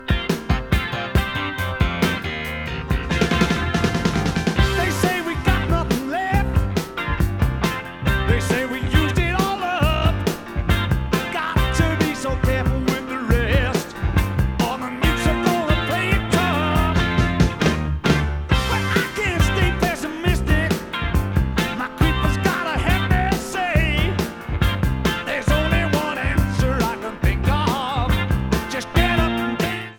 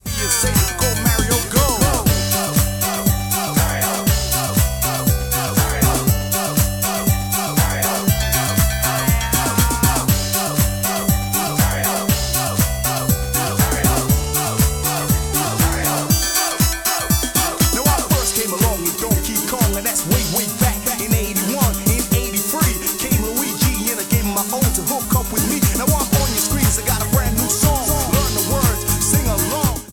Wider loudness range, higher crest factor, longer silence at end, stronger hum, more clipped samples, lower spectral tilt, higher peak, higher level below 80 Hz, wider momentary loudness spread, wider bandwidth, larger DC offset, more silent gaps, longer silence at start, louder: about the same, 2 LU vs 1 LU; about the same, 16 dB vs 14 dB; about the same, 0 s vs 0 s; neither; neither; first, -5.5 dB/octave vs -4 dB/octave; about the same, -2 dBFS vs -4 dBFS; about the same, -26 dBFS vs -26 dBFS; about the same, 5 LU vs 3 LU; about the same, 19.5 kHz vs over 20 kHz; neither; neither; about the same, 0 s vs 0.05 s; second, -21 LUFS vs -17 LUFS